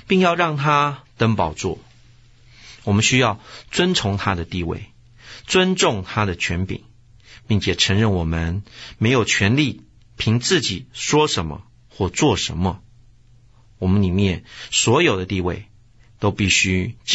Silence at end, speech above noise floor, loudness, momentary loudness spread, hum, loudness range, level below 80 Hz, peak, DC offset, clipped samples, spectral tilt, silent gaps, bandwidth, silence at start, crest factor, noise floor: 0 s; 32 dB; -19 LUFS; 13 LU; none; 3 LU; -42 dBFS; -2 dBFS; 0.1%; under 0.1%; -4.5 dB/octave; none; 8.2 kHz; 0.1 s; 18 dB; -51 dBFS